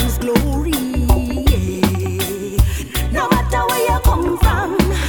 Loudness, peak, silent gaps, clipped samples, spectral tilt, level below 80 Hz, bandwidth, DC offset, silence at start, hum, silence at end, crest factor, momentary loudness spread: -17 LUFS; 0 dBFS; none; under 0.1%; -5.5 dB/octave; -20 dBFS; over 20 kHz; under 0.1%; 0 s; none; 0 s; 16 dB; 4 LU